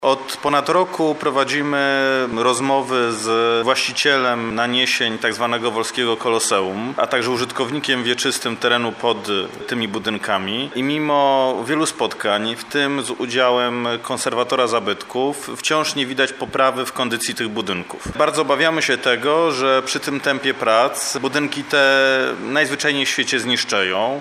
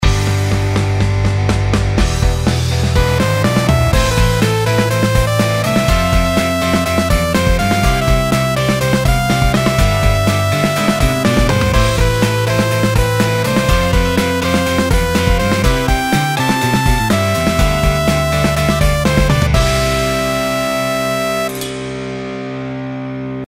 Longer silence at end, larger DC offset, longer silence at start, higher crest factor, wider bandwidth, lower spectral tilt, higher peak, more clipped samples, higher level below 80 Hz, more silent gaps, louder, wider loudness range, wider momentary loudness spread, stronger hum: about the same, 0 s vs 0 s; neither; about the same, 0 s vs 0 s; about the same, 18 dB vs 14 dB; about the same, 15 kHz vs 16.5 kHz; second, -3 dB/octave vs -5 dB/octave; about the same, -2 dBFS vs 0 dBFS; neither; second, -56 dBFS vs -20 dBFS; neither; second, -18 LUFS vs -14 LUFS; about the same, 3 LU vs 1 LU; first, 6 LU vs 3 LU; neither